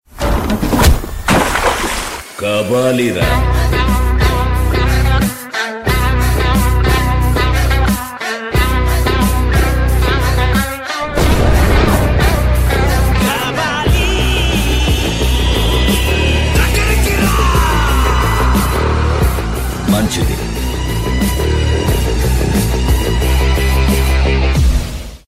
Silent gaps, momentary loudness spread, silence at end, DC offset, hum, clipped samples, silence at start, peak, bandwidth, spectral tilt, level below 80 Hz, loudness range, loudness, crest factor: none; 5 LU; 0.1 s; under 0.1%; none; under 0.1%; 0.15 s; 0 dBFS; 16 kHz; -5 dB/octave; -16 dBFS; 2 LU; -14 LUFS; 12 dB